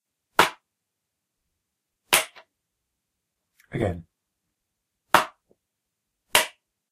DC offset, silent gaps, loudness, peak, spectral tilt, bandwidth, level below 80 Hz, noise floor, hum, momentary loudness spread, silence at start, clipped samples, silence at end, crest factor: under 0.1%; none; -23 LUFS; 0 dBFS; -2 dB/octave; 15.5 kHz; -58 dBFS; -82 dBFS; none; 14 LU; 0.4 s; under 0.1%; 0.45 s; 30 dB